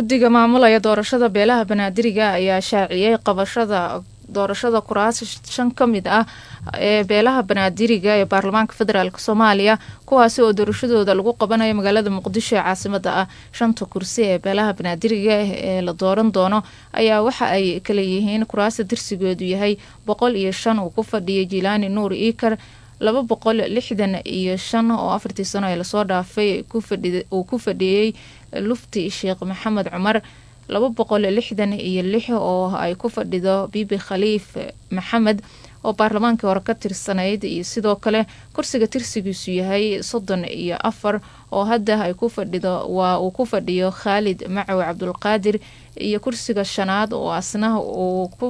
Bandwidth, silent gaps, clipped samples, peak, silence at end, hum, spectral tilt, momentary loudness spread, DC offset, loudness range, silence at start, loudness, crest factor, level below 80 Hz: 11 kHz; none; under 0.1%; 0 dBFS; 0 s; none; -5 dB/octave; 8 LU; under 0.1%; 5 LU; 0 s; -19 LUFS; 20 dB; -50 dBFS